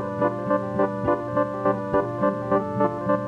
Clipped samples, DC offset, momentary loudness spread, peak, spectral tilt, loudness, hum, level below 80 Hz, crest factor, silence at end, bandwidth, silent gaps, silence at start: under 0.1%; under 0.1%; 2 LU; -6 dBFS; -9 dB/octave; -24 LUFS; none; -52 dBFS; 18 dB; 0 s; 8.2 kHz; none; 0 s